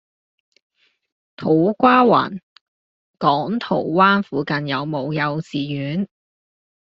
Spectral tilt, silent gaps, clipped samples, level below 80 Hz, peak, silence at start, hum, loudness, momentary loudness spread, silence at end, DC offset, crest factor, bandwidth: -4.5 dB/octave; 2.43-3.14 s; under 0.1%; -60 dBFS; -2 dBFS; 1.4 s; none; -19 LUFS; 12 LU; 0.8 s; under 0.1%; 18 dB; 7.6 kHz